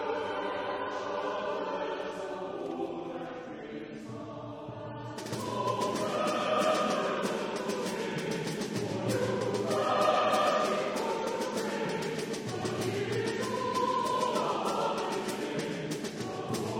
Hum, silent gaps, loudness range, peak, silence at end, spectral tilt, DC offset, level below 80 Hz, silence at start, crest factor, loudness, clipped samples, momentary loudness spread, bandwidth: none; none; 8 LU; -14 dBFS; 0 s; -4.5 dB/octave; under 0.1%; -68 dBFS; 0 s; 18 dB; -32 LUFS; under 0.1%; 13 LU; 17.5 kHz